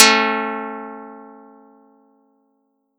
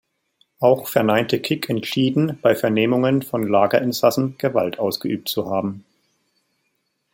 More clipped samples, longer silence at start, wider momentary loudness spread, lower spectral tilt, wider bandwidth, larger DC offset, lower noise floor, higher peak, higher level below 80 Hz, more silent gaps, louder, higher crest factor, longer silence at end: neither; second, 0 s vs 0.6 s; first, 26 LU vs 6 LU; second, -0.5 dB/octave vs -6 dB/octave; first, over 20 kHz vs 17 kHz; neither; second, -67 dBFS vs -71 dBFS; about the same, 0 dBFS vs 0 dBFS; second, -90 dBFS vs -64 dBFS; neither; about the same, -18 LUFS vs -20 LUFS; about the same, 22 dB vs 20 dB; first, 1.7 s vs 1.35 s